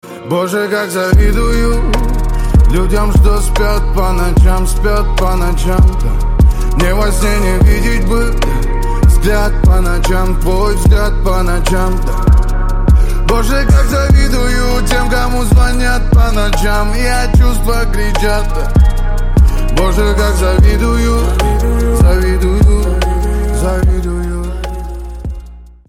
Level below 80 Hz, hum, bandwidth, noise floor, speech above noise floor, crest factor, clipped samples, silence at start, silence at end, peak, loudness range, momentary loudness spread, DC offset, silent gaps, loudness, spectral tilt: -10 dBFS; none; 15.5 kHz; -31 dBFS; 22 dB; 10 dB; under 0.1%; 0.05 s; 0.2 s; 0 dBFS; 1 LU; 6 LU; under 0.1%; none; -13 LUFS; -6 dB/octave